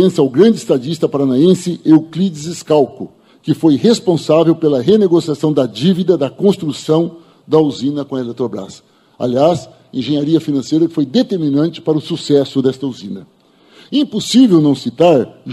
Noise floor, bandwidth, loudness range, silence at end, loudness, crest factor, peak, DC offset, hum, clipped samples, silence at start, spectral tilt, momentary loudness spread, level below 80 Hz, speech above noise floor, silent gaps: -45 dBFS; 12.5 kHz; 4 LU; 0 s; -14 LUFS; 14 dB; 0 dBFS; under 0.1%; none; under 0.1%; 0 s; -6.5 dB/octave; 11 LU; -58 dBFS; 32 dB; none